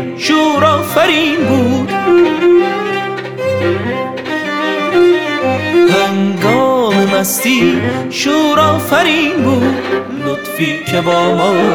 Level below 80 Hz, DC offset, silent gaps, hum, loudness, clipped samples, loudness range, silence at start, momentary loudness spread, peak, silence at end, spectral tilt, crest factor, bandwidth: -54 dBFS; under 0.1%; none; none; -12 LUFS; under 0.1%; 2 LU; 0 s; 7 LU; 0 dBFS; 0 s; -4.5 dB/octave; 12 dB; 18.5 kHz